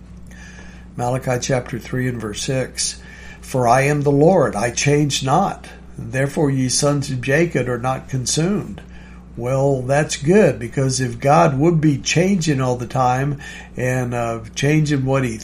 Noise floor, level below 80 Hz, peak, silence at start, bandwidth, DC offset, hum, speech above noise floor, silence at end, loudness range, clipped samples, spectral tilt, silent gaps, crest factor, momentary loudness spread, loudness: -37 dBFS; -42 dBFS; -2 dBFS; 0 s; 15 kHz; under 0.1%; none; 20 dB; 0 s; 4 LU; under 0.1%; -5 dB/octave; none; 18 dB; 16 LU; -18 LUFS